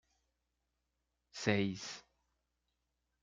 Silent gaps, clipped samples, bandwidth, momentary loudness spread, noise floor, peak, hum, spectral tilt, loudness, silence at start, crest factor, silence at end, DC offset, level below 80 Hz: none; under 0.1%; 9.2 kHz; 18 LU; -86 dBFS; -16 dBFS; 60 Hz at -70 dBFS; -5 dB/octave; -37 LUFS; 1.35 s; 28 dB; 1.25 s; under 0.1%; -78 dBFS